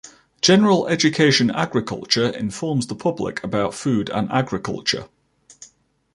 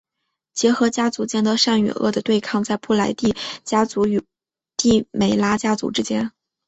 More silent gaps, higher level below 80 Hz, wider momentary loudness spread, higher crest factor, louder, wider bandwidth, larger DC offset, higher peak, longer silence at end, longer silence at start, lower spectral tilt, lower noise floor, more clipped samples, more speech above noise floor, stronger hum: neither; about the same, -54 dBFS vs -52 dBFS; about the same, 9 LU vs 7 LU; about the same, 18 dB vs 16 dB; about the same, -20 LUFS vs -20 LUFS; first, 11.5 kHz vs 8.2 kHz; neither; about the same, -2 dBFS vs -4 dBFS; about the same, 0.5 s vs 0.4 s; second, 0.05 s vs 0.55 s; about the same, -4.5 dB/octave vs -4.5 dB/octave; second, -56 dBFS vs -78 dBFS; neither; second, 36 dB vs 59 dB; neither